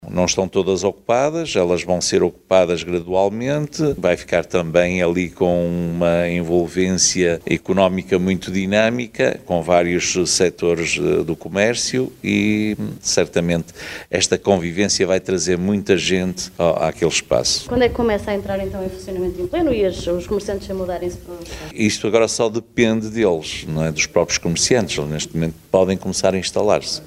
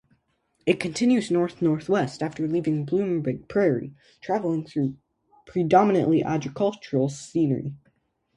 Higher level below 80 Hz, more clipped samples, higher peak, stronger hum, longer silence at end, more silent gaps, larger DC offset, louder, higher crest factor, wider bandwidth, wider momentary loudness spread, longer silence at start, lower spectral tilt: first, -42 dBFS vs -62 dBFS; neither; about the same, -2 dBFS vs -4 dBFS; neither; second, 0 s vs 0.6 s; neither; neither; first, -19 LUFS vs -24 LUFS; about the same, 18 dB vs 22 dB; first, 16 kHz vs 11.5 kHz; about the same, 7 LU vs 9 LU; second, 0 s vs 0.65 s; second, -4 dB/octave vs -7 dB/octave